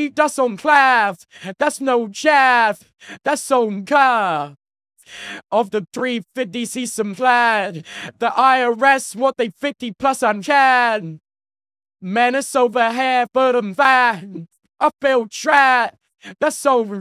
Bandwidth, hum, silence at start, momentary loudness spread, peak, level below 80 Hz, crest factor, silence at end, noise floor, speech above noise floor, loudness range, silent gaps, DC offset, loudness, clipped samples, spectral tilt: 15.5 kHz; none; 0 s; 13 LU; 0 dBFS; -68 dBFS; 18 dB; 0 s; under -90 dBFS; over 73 dB; 4 LU; none; under 0.1%; -17 LUFS; under 0.1%; -3.5 dB/octave